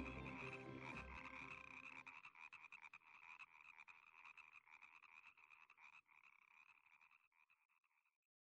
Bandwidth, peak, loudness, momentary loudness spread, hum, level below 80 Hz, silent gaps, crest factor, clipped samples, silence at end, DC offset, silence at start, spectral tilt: 9.6 kHz; -38 dBFS; -58 LUFS; 14 LU; none; -74 dBFS; 7.27-7.32 s, 7.65-7.69 s; 22 dB; under 0.1%; 0.45 s; under 0.1%; 0 s; -5.5 dB/octave